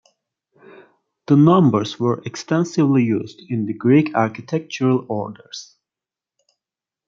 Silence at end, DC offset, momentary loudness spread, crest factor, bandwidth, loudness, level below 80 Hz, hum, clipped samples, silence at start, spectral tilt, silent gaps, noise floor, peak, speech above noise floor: 1.45 s; under 0.1%; 13 LU; 18 dB; 7.6 kHz; -18 LUFS; -64 dBFS; none; under 0.1%; 1.3 s; -7.5 dB/octave; none; -89 dBFS; 0 dBFS; 71 dB